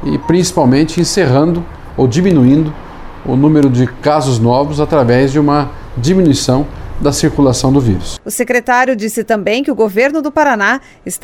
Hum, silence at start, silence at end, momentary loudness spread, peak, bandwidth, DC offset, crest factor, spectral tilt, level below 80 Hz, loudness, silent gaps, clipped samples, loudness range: none; 0 s; 0.05 s; 9 LU; 0 dBFS; 17 kHz; under 0.1%; 12 dB; -6 dB/octave; -30 dBFS; -12 LUFS; none; under 0.1%; 2 LU